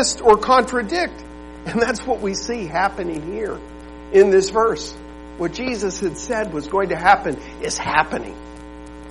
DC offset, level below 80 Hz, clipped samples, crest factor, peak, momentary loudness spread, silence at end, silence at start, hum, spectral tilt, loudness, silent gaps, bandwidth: 0.3%; -42 dBFS; under 0.1%; 18 dB; -2 dBFS; 23 LU; 0 s; 0 s; none; -3.5 dB/octave; -19 LUFS; none; 11.5 kHz